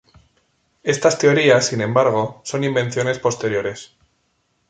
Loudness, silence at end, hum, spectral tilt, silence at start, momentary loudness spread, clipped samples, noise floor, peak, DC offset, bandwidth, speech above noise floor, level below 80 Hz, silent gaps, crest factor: -18 LUFS; 0.85 s; none; -4.5 dB/octave; 0.85 s; 10 LU; under 0.1%; -67 dBFS; -2 dBFS; under 0.1%; 9.4 kHz; 49 dB; -60 dBFS; none; 18 dB